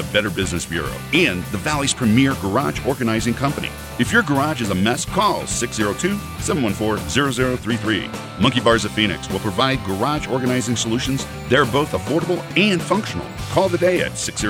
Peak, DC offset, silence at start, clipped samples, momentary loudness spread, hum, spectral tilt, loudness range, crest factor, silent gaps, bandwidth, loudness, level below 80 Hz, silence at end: -2 dBFS; under 0.1%; 0 s; under 0.1%; 6 LU; none; -4.5 dB/octave; 1 LU; 18 dB; none; 17.5 kHz; -20 LUFS; -40 dBFS; 0 s